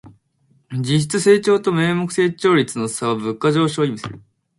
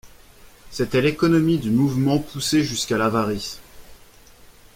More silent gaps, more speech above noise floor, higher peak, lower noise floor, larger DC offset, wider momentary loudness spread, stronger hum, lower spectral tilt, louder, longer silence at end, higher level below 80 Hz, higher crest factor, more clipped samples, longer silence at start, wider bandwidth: neither; first, 42 dB vs 28 dB; first, -2 dBFS vs -6 dBFS; first, -60 dBFS vs -48 dBFS; neither; about the same, 9 LU vs 11 LU; neither; about the same, -5.5 dB/octave vs -5.5 dB/octave; first, -18 LUFS vs -21 LUFS; second, 0.4 s vs 0.8 s; second, -58 dBFS vs -48 dBFS; about the same, 16 dB vs 16 dB; neither; about the same, 0.05 s vs 0.05 s; second, 11.5 kHz vs 16.5 kHz